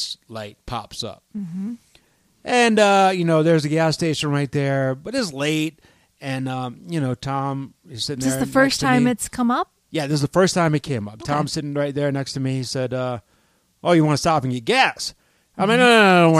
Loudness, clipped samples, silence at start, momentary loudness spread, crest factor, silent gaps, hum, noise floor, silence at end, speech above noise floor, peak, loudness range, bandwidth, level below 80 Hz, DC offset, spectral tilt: -20 LUFS; under 0.1%; 0 s; 15 LU; 18 dB; none; none; -62 dBFS; 0 s; 42 dB; -2 dBFS; 6 LU; 15.5 kHz; -52 dBFS; under 0.1%; -5 dB/octave